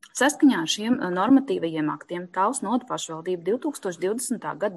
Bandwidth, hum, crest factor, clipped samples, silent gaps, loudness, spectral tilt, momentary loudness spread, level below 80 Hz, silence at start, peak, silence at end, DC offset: 12.5 kHz; none; 16 dB; under 0.1%; none; -24 LUFS; -4 dB/octave; 10 LU; -70 dBFS; 0.05 s; -8 dBFS; 0 s; under 0.1%